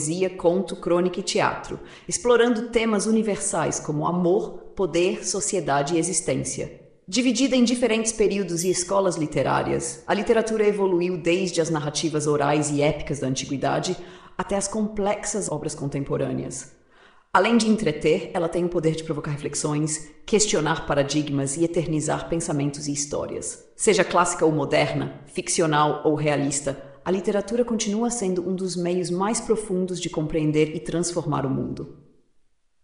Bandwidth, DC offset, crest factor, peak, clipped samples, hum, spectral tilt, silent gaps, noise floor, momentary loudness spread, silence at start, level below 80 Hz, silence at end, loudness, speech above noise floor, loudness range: 11 kHz; under 0.1%; 20 dB; -4 dBFS; under 0.1%; none; -4.5 dB/octave; none; -62 dBFS; 8 LU; 0 s; -48 dBFS; 0.9 s; -23 LUFS; 38 dB; 3 LU